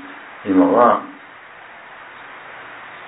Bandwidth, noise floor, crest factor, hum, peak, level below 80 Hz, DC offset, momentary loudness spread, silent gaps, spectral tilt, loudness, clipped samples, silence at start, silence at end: 4 kHz; -40 dBFS; 20 dB; none; -2 dBFS; -66 dBFS; under 0.1%; 25 LU; none; -10.5 dB/octave; -15 LUFS; under 0.1%; 0 s; 0 s